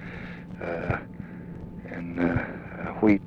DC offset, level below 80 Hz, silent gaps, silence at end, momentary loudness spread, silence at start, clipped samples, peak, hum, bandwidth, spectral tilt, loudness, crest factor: under 0.1%; -48 dBFS; none; 0 s; 14 LU; 0 s; under 0.1%; -8 dBFS; none; 6.4 kHz; -9.5 dB/octave; -31 LUFS; 20 dB